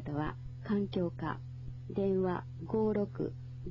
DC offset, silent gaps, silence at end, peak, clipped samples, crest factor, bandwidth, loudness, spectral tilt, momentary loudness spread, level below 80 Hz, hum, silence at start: under 0.1%; none; 0 s; -20 dBFS; under 0.1%; 16 dB; 6.8 kHz; -36 LUFS; -10 dB/octave; 13 LU; -54 dBFS; none; 0 s